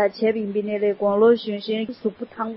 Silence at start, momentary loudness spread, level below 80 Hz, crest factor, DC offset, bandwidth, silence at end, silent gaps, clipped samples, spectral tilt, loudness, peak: 0 s; 11 LU; -66 dBFS; 16 dB; under 0.1%; 5.8 kHz; 0 s; none; under 0.1%; -10.5 dB/octave; -22 LUFS; -6 dBFS